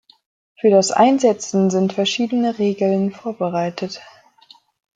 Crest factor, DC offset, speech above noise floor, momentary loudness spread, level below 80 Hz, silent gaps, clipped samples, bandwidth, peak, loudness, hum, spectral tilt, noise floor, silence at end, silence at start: 16 dB; under 0.1%; 34 dB; 11 LU; -66 dBFS; none; under 0.1%; 9.4 kHz; -2 dBFS; -18 LUFS; none; -5 dB/octave; -51 dBFS; 0.95 s; 0.65 s